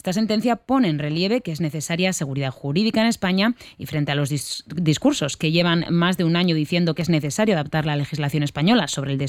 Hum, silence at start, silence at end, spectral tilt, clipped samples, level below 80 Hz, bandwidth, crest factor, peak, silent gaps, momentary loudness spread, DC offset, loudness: none; 0.05 s; 0 s; -5.5 dB/octave; under 0.1%; -54 dBFS; 16 kHz; 16 dB; -6 dBFS; none; 6 LU; under 0.1%; -21 LUFS